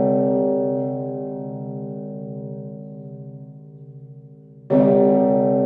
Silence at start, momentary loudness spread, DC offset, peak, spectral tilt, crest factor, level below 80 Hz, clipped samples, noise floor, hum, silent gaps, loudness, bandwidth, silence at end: 0 s; 25 LU; under 0.1%; -4 dBFS; -13 dB/octave; 16 dB; -64 dBFS; under 0.1%; -44 dBFS; none; none; -21 LUFS; 3.6 kHz; 0 s